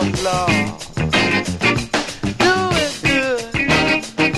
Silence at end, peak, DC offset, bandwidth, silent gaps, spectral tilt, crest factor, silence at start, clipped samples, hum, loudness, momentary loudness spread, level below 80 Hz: 0 s; -2 dBFS; under 0.1%; 14 kHz; none; -4 dB/octave; 16 dB; 0 s; under 0.1%; none; -17 LUFS; 6 LU; -38 dBFS